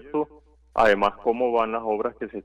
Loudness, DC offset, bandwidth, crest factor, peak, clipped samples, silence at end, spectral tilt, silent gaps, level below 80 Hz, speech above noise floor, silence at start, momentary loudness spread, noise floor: -24 LUFS; under 0.1%; 9.6 kHz; 16 dB; -8 dBFS; under 0.1%; 0.05 s; -5.5 dB/octave; none; -50 dBFS; 30 dB; 0.05 s; 11 LU; -53 dBFS